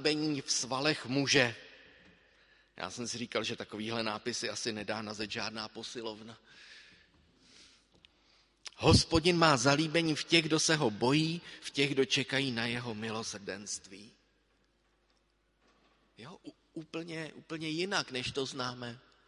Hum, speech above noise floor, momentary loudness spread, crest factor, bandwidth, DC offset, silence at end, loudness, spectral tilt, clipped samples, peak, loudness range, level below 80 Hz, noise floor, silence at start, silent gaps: none; 41 dB; 22 LU; 26 dB; 11.5 kHz; under 0.1%; 0.3 s; -32 LUFS; -3.5 dB/octave; under 0.1%; -8 dBFS; 18 LU; -54 dBFS; -74 dBFS; 0 s; none